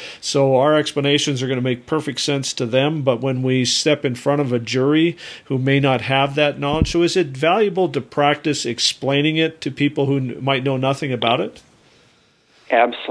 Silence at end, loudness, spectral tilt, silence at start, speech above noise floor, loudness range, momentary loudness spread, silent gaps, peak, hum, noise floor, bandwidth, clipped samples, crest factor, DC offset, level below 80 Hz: 0 s; -18 LUFS; -5 dB/octave; 0 s; 38 dB; 2 LU; 5 LU; none; -2 dBFS; none; -56 dBFS; 11 kHz; under 0.1%; 18 dB; under 0.1%; -42 dBFS